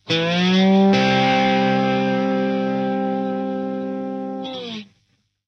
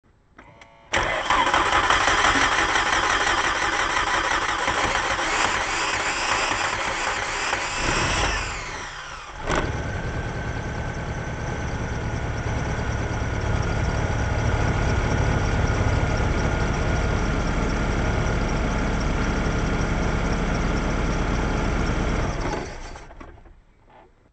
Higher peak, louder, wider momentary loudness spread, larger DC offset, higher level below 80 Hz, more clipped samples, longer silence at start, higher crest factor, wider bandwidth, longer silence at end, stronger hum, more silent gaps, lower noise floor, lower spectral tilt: about the same, -6 dBFS vs -4 dBFS; first, -19 LUFS vs -23 LUFS; first, 13 LU vs 10 LU; neither; second, -60 dBFS vs -30 dBFS; neither; second, 0.05 s vs 0.4 s; second, 12 dB vs 20 dB; second, 6.8 kHz vs 9.2 kHz; first, 0.65 s vs 0.3 s; neither; neither; first, -66 dBFS vs -52 dBFS; first, -6.5 dB/octave vs -4 dB/octave